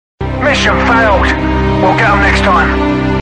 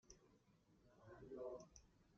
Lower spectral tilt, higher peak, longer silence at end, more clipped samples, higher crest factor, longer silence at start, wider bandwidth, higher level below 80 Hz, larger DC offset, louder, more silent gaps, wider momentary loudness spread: about the same, -6 dB/octave vs -6 dB/octave; first, -2 dBFS vs -40 dBFS; about the same, 0 s vs 0 s; neither; second, 8 dB vs 20 dB; first, 0.2 s vs 0.05 s; first, 9.6 kHz vs 7.2 kHz; first, -20 dBFS vs -78 dBFS; neither; first, -10 LUFS vs -57 LUFS; neither; second, 4 LU vs 15 LU